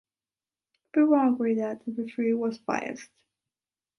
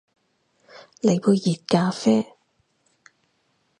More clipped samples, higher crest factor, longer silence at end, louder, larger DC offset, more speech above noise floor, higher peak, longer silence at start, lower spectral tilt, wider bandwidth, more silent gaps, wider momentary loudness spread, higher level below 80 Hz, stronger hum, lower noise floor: neither; about the same, 18 dB vs 22 dB; second, 0.95 s vs 1.55 s; second, -27 LUFS vs -21 LUFS; neither; first, over 64 dB vs 49 dB; second, -10 dBFS vs -4 dBFS; about the same, 0.95 s vs 1.05 s; about the same, -6.5 dB/octave vs -6.5 dB/octave; about the same, 10.5 kHz vs 10.5 kHz; neither; first, 12 LU vs 4 LU; second, -78 dBFS vs -68 dBFS; neither; first, under -90 dBFS vs -69 dBFS